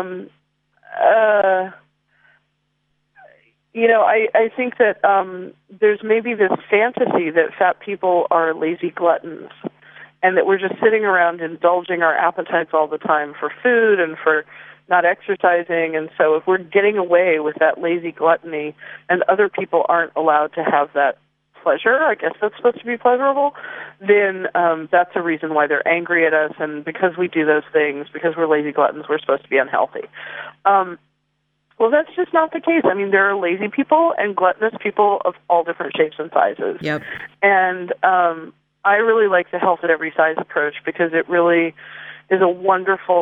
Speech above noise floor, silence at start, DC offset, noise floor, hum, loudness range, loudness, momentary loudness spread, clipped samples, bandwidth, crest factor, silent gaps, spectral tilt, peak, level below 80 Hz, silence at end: 52 dB; 0 s; under 0.1%; -69 dBFS; none; 2 LU; -18 LUFS; 9 LU; under 0.1%; 5 kHz; 16 dB; none; -8 dB/octave; -2 dBFS; -72 dBFS; 0 s